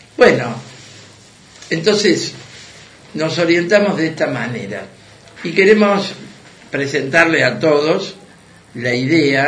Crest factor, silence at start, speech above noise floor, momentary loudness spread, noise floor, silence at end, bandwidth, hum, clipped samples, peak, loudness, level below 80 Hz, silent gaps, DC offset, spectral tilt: 16 dB; 0.2 s; 29 dB; 18 LU; -44 dBFS; 0 s; 10.5 kHz; none; under 0.1%; 0 dBFS; -15 LUFS; -56 dBFS; none; under 0.1%; -5 dB/octave